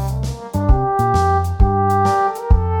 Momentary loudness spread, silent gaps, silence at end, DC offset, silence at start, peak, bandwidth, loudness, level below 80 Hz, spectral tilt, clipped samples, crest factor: 7 LU; none; 0 s; under 0.1%; 0 s; -2 dBFS; 18 kHz; -17 LUFS; -20 dBFS; -7.5 dB/octave; under 0.1%; 14 dB